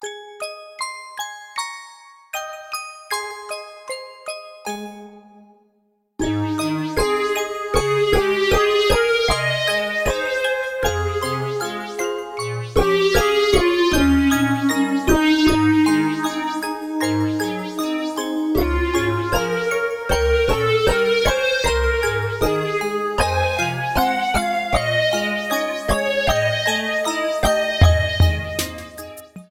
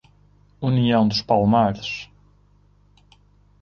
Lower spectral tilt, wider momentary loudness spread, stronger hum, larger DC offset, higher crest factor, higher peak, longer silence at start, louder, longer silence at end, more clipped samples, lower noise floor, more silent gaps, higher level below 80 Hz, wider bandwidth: second, -4.5 dB/octave vs -7 dB/octave; about the same, 14 LU vs 13 LU; second, none vs 50 Hz at -40 dBFS; neither; about the same, 18 dB vs 18 dB; about the same, -2 dBFS vs -4 dBFS; second, 0 s vs 0.6 s; about the same, -20 LUFS vs -20 LUFS; second, 0.05 s vs 1.6 s; neither; first, -65 dBFS vs -56 dBFS; neither; first, -32 dBFS vs -52 dBFS; first, 17 kHz vs 7 kHz